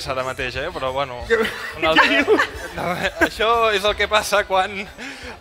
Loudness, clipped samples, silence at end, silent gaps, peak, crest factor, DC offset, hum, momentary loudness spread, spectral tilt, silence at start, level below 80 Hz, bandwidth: -19 LUFS; under 0.1%; 0 s; none; 0 dBFS; 20 dB; under 0.1%; none; 11 LU; -3.5 dB/octave; 0 s; -42 dBFS; 16 kHz